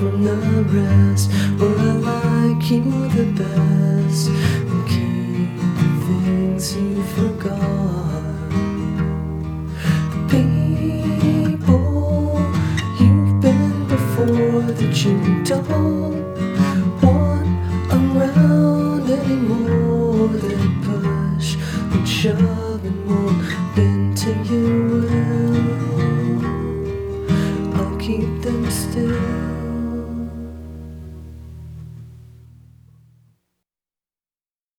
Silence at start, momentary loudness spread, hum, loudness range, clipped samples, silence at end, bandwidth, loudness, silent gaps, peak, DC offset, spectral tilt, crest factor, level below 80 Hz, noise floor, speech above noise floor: 0 s; 9 LU; none; 6 LU; under 0.1%; 2.65 s; 16.5 kHz; -18 LUFS; none; -2 dBFS; under 0.1%; -7 dB/octave; 16 dB; -36 dBFS; under -90 dBFS; over 73 dB